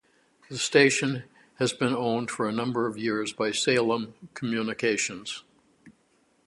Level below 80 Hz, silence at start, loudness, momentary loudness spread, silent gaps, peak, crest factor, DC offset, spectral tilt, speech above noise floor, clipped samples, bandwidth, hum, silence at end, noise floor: -70 dBFS; 0.5 s; -26 LUFS; 15 LU; none; -4 dBFS; 24 dB; under 0.1%; -3.5 dB/octave; 40 dB; under 0.1%; 11.5 kHz; none; 0.6 s; -67 dBFS